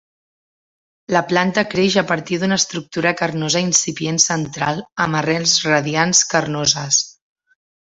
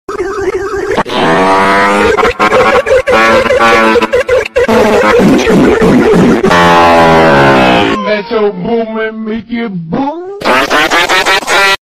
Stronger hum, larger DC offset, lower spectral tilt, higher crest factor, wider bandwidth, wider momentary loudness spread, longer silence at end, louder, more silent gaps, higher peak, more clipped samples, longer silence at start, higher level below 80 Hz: neither; neither; second, -2.5 dB/octave vs -5 dB/octave; first, 18 dB vs 8 dB; second, 8.2 kHz vs 16 kHz; second, 6 LU vs 11 LU; first, 0.85 s vs 0.1 s; second, -17 LUFS vs -8 LUFS; first, 4.92-4.96 s vs none; about the same, 0 dBFS vs 0 dBFS; second, under 0.1% vs 0.7%; first, 1.1 s vs 0.1 s; second, -56 dBFS vs -32 dBFS